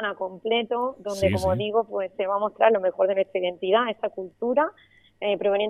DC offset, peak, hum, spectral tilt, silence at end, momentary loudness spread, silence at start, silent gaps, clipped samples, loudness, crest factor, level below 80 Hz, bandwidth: under 0.1%; -6 dBFS; none; -5.5 dB/octave; 0 s; 9 LU; 0 s; none; under 0.1%; -25 LUFS; 20 dB; -58 dBFS; 14 kHz